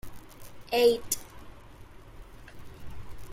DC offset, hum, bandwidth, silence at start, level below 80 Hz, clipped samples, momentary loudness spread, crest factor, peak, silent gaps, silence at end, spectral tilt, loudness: under 0.1%; none; 16.5 kHz; 0.05 s; -50 dBFS; under 0.1%; 27 LU; 22 dB; -10 dBFS; none; 0 s; -3 dB/octave; -27 LUFS